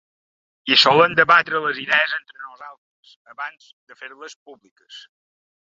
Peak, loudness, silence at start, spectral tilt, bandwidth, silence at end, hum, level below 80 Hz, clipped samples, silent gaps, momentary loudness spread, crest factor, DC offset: 0 dBFS; -16 LUFS; 0.65 s; -3 dB/octave; 7.6 kHz; 0.75 s; none; -68 dBFS; under 0.1%; 2.78-3.03 s, 3.16-3.25 s, 3.73-3.87 s, 4.36-4.46 s, 4.71-4.76 s; 26 LU; 22 dB; under 0.1%